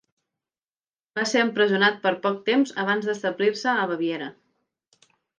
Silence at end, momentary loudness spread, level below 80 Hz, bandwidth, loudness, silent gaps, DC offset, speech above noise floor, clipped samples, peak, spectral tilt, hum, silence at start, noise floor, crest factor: 1.1 s; 8 LU; -80 dBFS; 9.8 kHz; -23 LUFS; none; under 0.1%; over 67 dB; under 0.1%; -6 dBFS; -4 dB/octave; none; 1.15 s; under -90 dBFS; 18 dB